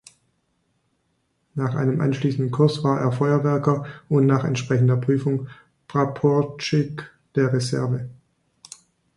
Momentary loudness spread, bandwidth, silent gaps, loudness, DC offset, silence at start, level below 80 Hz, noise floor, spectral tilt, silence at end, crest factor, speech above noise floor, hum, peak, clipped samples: 11 LU; 11.5 kHz; none; -22 LUFS; under 0.1%; 1.55 s; -60 dBFS; -70 dBFS; -7.5 dB/octave; 1.05 s; 18 dB; 49 dB; none; -4 dBFS; under 0.1%